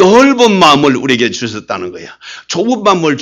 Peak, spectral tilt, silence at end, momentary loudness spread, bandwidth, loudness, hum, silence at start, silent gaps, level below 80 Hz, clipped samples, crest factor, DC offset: 0 dBFS; -4.5 dB/octave; 0 s; 19 LU; 14 kHz; -10 LUFS; none; 0 s; none; -48 dBFS; 0.4%; 10 dB; under 0.1%